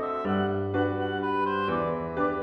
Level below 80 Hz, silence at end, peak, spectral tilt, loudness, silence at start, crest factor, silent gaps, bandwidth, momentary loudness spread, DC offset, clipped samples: -56 dBFS; 0 s; -16 dBFS; -8.5 dB/octave; -28 LUFS; 0 s; 12 dB; none; 5.8 kHz; 2 LU; under 0.1%; under 0.1%